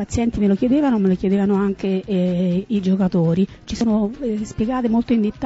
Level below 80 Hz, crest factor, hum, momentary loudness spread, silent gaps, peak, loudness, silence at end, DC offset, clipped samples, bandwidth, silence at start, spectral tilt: -40 dBFS; 12 dB; none; 6 LU; none; -8 dBFS; -19 LUFS; 0 s; under 0.1%; under 0.1%; 8 kHz; 0 s; -8 dB/octave